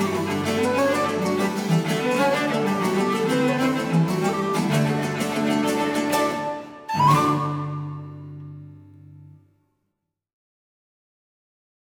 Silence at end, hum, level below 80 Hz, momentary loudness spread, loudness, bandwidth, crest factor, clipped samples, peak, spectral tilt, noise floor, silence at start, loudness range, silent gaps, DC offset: 2.7 s; none; -64 dBFS; 12 LU; -22 LUFS; 19 kHz; 18 dB; under 0.1%; -6 dBFS; -5.5 dB/octave; -79 dBFS; 0 s; 6 LU; none; under 0.1%